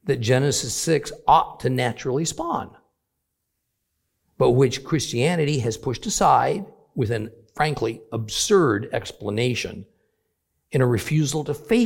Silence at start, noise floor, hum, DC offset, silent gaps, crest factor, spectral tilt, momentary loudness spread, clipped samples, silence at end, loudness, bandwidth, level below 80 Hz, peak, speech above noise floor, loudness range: 0.05 s; -78 dBFS; none; under 0.1%; none; 18 dB; -5 dB/octave; 11 LU; under 0.1%; 0 s; -22 LUFS; 16.5 kHz; -50 dBFS; -4 dBFS; 56 dB; 3 LU